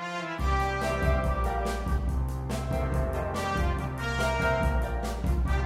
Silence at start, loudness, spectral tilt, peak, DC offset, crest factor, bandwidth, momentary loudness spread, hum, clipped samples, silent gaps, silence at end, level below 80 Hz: 0 s; -29 LUFS; -6 dB/octave; -12 dBFS; under 0.1%; 14 dB; 14.5 kHz; 5 LU; none; under 0.1%; none; 0 s; -30 dBFS